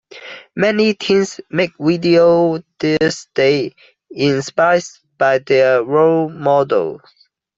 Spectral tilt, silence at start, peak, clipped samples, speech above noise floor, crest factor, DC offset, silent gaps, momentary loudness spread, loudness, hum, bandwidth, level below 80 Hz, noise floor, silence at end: -5.5 dB/octave; 0.15 s; -2 dBFS; under 0.1%; 21 dB; 14 dB; under 0.1%; none; 10 LU; -15 LUFS; none; 7.8 kHz; -58 dBFS; -36 dBFS; 0.6 s